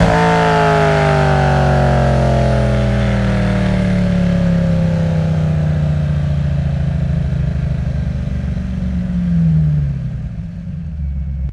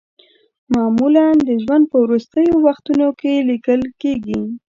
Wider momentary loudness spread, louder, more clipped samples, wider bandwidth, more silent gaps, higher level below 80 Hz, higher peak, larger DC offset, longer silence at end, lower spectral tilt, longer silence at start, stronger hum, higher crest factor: about the same, 10 LU vs 8 LU; about the same, -15 LUFS vs -16 LUFS; neither; first, 11 kHz vs 7.4 kHz; neither; first, -24 dBFS vs -50 dBFS; about the same, 0 dBFS vs -2 dBFS; neither; second, 0 s vs 0.15 s; about the same, -8 dB/octave vs -7.5 dB/octave; second, 0 s vs 0.7 s; neither; about the same, 14 dB vs 14 dB